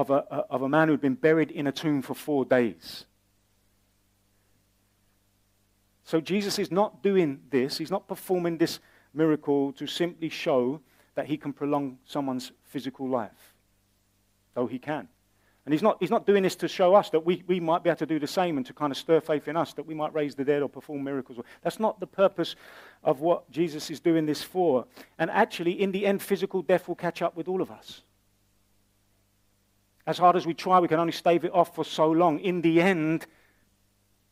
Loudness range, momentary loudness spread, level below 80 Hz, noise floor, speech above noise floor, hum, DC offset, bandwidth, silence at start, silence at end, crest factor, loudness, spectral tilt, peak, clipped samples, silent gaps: 8 LU; 12 LU; -72 dBFS; -68 dBFS; 42 dB; 50 Hz at -60 dBFS; under 0.1%; 16 kHz; 0 s; 1.05 s; 20 dB; -27 LUFS; -6 dB/octave; -8 dBFS; under 0.1%; none